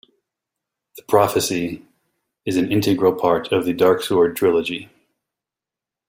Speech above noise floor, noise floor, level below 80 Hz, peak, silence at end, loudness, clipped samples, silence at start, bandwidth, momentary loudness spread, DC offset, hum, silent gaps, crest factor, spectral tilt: 70 dB; -88 dBFS; -58 dBFS; -2 dBFS; 1.25 s; -19 LUFS; under 0.1%; 0.95 s; 16.5 kHz; 11 LU; under 0.1%; none; none; 20 dB; -5 dB/octave